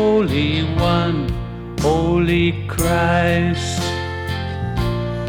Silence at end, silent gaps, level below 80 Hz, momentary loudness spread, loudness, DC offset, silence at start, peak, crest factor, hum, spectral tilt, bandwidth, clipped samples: 0 s; none; -32 dBFS; 8 LU; -19 LUFS; under 0.1%; 0 s; -4 dBFS; 14 dB; none; -6 dB/octave; over 20 kHz; under 0.1%